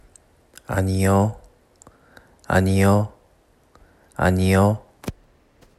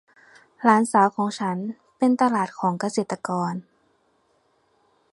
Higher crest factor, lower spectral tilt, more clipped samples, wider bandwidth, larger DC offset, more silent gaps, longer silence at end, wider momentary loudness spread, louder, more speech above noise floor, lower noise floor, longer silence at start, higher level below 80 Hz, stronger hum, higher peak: about the same, 18 dB vs 22 dB; about the same, -7 dB/octave vs -6 dB/octave; neither; first, 14 kHz vs 11.5 kHz; neither; neither; second, 0.65 s vs 1.5 s; first, 19 LU vs 11 LU; first, -20 LUFS vs -23 LUFS; second, 40 dB vs 44 dB; second, -58 dBFS vs -66 dBFS; about the same, 0.7 s vs 0.6 s; first, -50 dBFS vs -74 dBFS; neither; about the same, -4 dBFS vs -2 dBFS